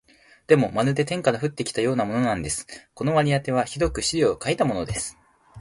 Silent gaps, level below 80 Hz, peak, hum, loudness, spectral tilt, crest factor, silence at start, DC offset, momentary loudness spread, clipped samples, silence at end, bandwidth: none; -46 dBFS; -4 dBFS; none; -23 LUFS; -5 dB/octave; 20 dB; 0.5 s; under 0.1%; 8 LU; under 0.1%; 0 s; 11.5 kHz